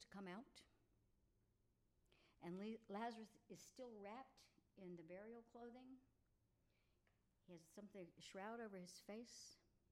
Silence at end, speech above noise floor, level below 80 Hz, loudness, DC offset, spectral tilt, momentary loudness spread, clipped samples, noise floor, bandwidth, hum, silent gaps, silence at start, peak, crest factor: 0.15 s; 26 dB; -86 dBFS; -58 LUFS; under 0.1%; -5 dB/octave; 11 LU; under 0.1%; -83 dBFS; 14.5 kHz; none; none; 0 s; -40 dBFS; 20 dB